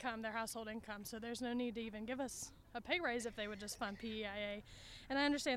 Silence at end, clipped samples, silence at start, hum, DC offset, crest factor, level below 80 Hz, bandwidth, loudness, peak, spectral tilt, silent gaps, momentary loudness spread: 0 s; under 0.1%; 0 s; none; under 0.1%; 18 dB; -66 dBFS; 16.5 kHz; -43 LUFS; -24 dBFS; -3 dB/octave; none; 11 LU